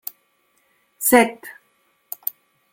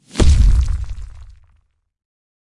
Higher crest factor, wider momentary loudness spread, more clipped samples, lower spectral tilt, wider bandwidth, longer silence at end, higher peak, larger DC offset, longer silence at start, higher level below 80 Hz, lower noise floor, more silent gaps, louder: first, 22 dB vs 14 dB; about the same, 23 LU vs 21 LU; neither; second, -2.5 dB/octave vs -6 dB/octave; first, 17 kHz vs 11.5 kHz; second, 1.2 s vs 1.35 s; about the same, -2 dBFS vs -2 dBFS; neither; first, 1 s vs 0.15 s; second, -66 dBFS vs -18 dBFS; first, -65 dBFS vs -60 dBFS; neither; about the same, -19 LUFS vs -17 LUFS